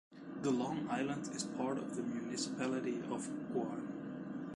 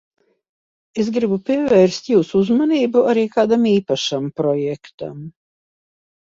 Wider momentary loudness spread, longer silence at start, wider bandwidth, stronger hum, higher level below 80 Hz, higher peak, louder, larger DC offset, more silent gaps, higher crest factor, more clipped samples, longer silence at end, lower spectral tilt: second, 7 LU vs 16 LU; second, 0.1 s vs 0.95 s; first, 11 kHz vs 7.8 kHz; neither; second, -76 dBFS vs -60 dBFS; second, -22 dBFS vs -2 dBFS; second, -40 LUFS vs -17 LUFS; neither; second, none vs 4.94-4.98 s; about the same, 16 dB vs 16 dB; neither; second, 0 s vs 1 s; about the same, -5 dB/octave vs -6 dB/octave